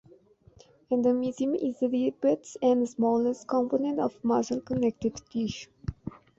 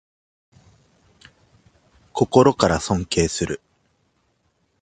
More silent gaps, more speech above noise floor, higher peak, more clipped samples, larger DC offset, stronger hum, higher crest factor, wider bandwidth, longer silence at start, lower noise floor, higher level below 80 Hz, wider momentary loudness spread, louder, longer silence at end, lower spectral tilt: neither; second, 31 dB vs 49 dB; second, -12 dBFS vs 0 dBFS; neither; neither; neither; second, 16 dB vs 24 dB; second, 8 kHz vs 9.6 kHz; second, 0.9 s vs 2.15 s; second, -58 dBFS vs -67 dBFS; second, -54 dBFS vs -44 dBFS; second, 9 LU vs 14 LU; second, -28 LUFS vs -20 LUFS; second, 0.3 s vs 1.25 s; first, -6.5 dB/octave vs -5 dB/octave